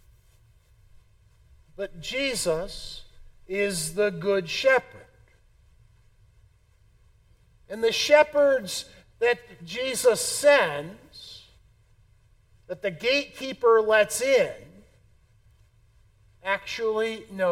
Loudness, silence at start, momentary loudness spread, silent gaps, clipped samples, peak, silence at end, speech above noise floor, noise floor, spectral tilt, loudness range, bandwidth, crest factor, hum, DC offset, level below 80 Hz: -24 LUFS; 1.8 s; 21 LU; none; under 0.1%; -6 dBFS; 0 s; 36 dB; -60 dBFS; -2.5 dB/octave; 7 LU; 16.5 kHz; 22 dB; none; under 0.1%; -56 dBFS